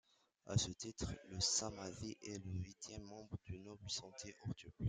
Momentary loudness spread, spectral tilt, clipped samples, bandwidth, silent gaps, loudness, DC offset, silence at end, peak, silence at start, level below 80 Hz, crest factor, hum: 15 LU; -3.5 dB/octave; under 0.1%; 10 kHz; none; -45 LUFS; under 0.1%; 0 s; -24 dBFS; 0.45 s; -62 dBFS; 22 dB; none